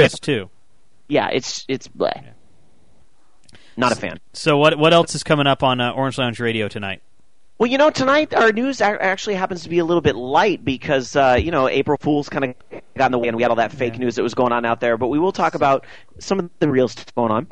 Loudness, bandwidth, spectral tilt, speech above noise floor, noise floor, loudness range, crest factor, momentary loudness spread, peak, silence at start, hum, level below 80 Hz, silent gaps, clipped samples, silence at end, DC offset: -19 LUFS; 10.5 kHz; -5 dB/octave; 44 dB; -62 dBFS; 6 LU; 18 dB; 9 LU; -2 dBFS; 0 s; none; -48 dBFS; none; under 0.1%; 0.05 s; 0.8%